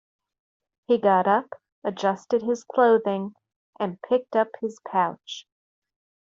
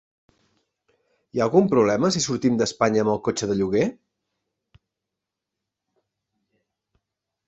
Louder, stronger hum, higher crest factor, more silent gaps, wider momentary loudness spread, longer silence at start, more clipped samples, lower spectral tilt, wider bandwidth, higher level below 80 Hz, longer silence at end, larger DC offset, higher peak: about the same, -24 LUFS vs -22 LUFS; neither; about the same, 18 dB vs 22 dB; first, 1.72-1.82 s, 3.56-3.73 s vs none; first, 16 LU vs 6 LU; second, 0.9 s vs 1.35 s; neither; about the same, -4 dB/octave vs -5 dB/octave; about the same, 7.6 kHz vs 8.2 kHz; second, -74 dBFS vs -58 dBFS; second, 0.85 s vs 3.55 s; neither; about the same, -6 dBFS vs -4 dBFS